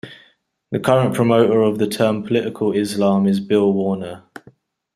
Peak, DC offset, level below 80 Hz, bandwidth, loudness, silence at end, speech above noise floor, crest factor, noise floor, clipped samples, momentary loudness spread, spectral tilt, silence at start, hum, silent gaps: -2 dBFS; under 0.1%; -60 dBFS; 14.5 kHz; -18 LUFS; 0.8 s; 41 dB; 16 dB; -58 dBFS; under 0.1%; 12 LU; -6.5 dB/octave; 0.05 s; none; none